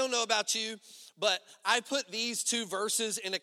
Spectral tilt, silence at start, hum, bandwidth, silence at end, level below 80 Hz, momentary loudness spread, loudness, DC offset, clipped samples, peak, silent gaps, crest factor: 0 dB/octave; 0 s; none; 16 kHz; 0.05 s; -86 dBFS; 5 LU; -31 LUFS; under 0.1%; under 0.1%; -12 dBFS; none; 20 dB